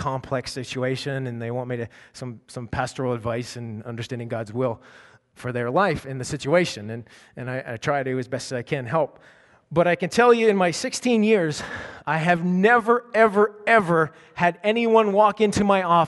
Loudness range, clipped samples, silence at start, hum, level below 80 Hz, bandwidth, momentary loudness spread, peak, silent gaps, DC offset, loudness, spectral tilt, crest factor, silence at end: 10 LU; under 0.1%; 0 s; none; -56 dBFS; 11.5 kHz; 15 LU; -4 dBFS; none; under 0.1%; -22 LUFS; -5.5 dB/octave; 20 dB; 0 s